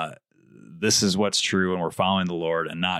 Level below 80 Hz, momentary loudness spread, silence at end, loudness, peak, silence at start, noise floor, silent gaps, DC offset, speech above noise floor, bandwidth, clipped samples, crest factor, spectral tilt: -62 dBFS; 7 LU; 0 s; -23 LUFS; -8 dBFS; 0 s; -53 dBFS; none; under 0.1%; 29 dB; 14.5 kHz; under 0.1%; 18 dB; -3.5 dB/octave